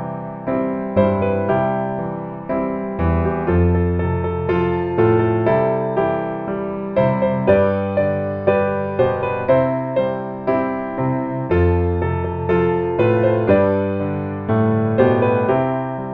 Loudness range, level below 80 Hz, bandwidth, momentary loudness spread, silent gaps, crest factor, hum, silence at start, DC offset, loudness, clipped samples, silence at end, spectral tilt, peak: 2 LU; -38 dBFS; 4.9 kHz; 8 LU; none; 16 dB; none; 0 s; under 0.1%; -19 LUFS; under 0.1%; 0 s; -11 dB/octave; -2 dBFS